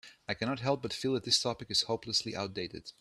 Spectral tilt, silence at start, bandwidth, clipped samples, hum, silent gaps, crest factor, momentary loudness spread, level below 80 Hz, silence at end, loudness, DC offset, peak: -3.5 dB/octave; 0.05 s; 13.5 kHz; under 0.1%; none; none; 20 dB; 10 LU; -66 dBFS; 0.1 s; -32 LUFS; under 0.1%; -14 dBFS